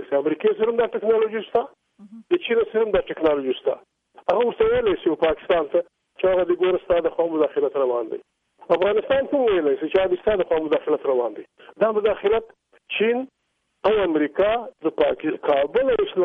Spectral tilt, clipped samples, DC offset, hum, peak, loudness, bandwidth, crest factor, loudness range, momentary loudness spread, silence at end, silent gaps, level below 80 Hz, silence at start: -7.5 dB/octave; under 0.1%; under 0.1%; none; -8 dBFS; -22 LUFS; 4 kHz; 14 dB; 2 LU; 6 LU; 0 s; none; -52 dBFS; 0 s